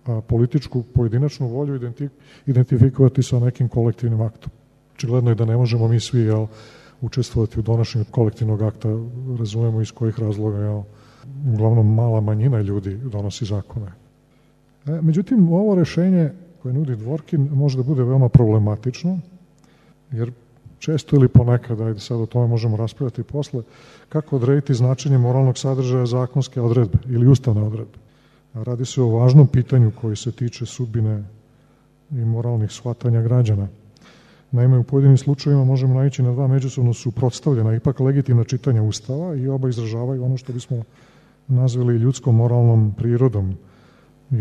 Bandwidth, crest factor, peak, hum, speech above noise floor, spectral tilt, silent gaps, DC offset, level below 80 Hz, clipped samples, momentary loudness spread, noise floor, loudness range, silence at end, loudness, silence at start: 8.4 kHz; 18 dB; 0 dBFS; none; 37 dB; -8.5 dB/octave; none; under 0.1%; -44 dBFS; under 0.1%; 12 LU; -55 dBFS; 5 LU; 0 s; -19 LUFS; 0.05 s